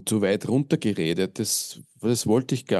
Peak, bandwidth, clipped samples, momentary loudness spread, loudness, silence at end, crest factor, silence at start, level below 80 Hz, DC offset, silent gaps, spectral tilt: -8 dBFS; 12.5 kHz; under 0.1%; 4 LU; -24 LUFS; 0 s; 16 dB; 0 s; -64 dBFS; under 0.1%; none; -5 dB/octave